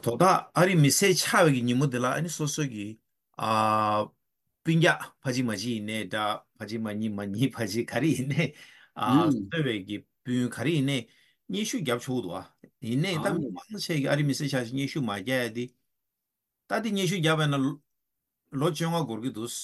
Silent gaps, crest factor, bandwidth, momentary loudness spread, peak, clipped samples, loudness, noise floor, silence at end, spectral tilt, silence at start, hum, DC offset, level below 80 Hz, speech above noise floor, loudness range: none; 18 dB; 13 kHz; 13 LU; -8 dBFS; under 0.1%; -27 LUFS; -85 dBFS; 0 s; -5 dB/octave; 0.05 s; none; under 0.1%; -70 dBFS; 58 dB; 5 LU